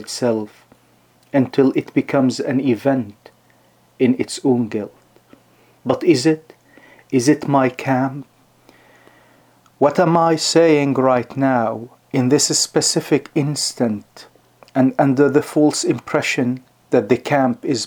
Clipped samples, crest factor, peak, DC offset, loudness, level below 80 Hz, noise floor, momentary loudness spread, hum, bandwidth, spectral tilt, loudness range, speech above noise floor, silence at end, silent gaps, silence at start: under 0.1%; 18 dB; -2 dBFS; under 0.1%; -17 LUFS; -66 dBFS; -55 dBFS; 10 LU; none; 19 kHz; -4.5 dB/octave; 5 LU; 38 dB; 0 s; none; 0 s